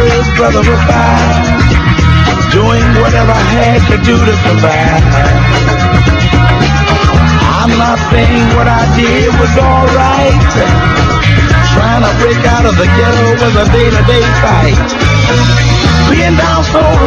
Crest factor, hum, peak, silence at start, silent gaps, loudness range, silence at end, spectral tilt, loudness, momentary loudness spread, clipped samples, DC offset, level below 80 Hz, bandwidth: 6 dB; none; 0 dBFS; 0 s; none; 0 LU; 0 s; -6 dB/octave; -8 LUFS; 1 LU; 2%; under 0.1%; -14 dBFS; 7.8 kHz